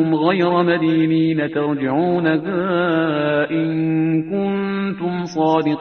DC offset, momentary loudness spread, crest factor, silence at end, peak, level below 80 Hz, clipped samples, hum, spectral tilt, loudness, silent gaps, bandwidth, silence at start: under 0.1%; 5 LU; 16 dB; 0 s; -2 dBFS; -58 dBFS; under 0.1%; none; -8 dB/octave; -18 LUFS; none; 6.4 kHz; 0 s